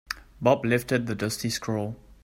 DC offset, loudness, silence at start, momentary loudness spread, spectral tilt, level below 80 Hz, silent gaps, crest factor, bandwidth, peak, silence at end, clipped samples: under 0.1%; -27 LUFS; 0.1 s; 9 LU; -5 dB/octave; -54 dBFS; none; 22 dB; 16 kHz; -6 dBFS; 0.1 s; under 0.1%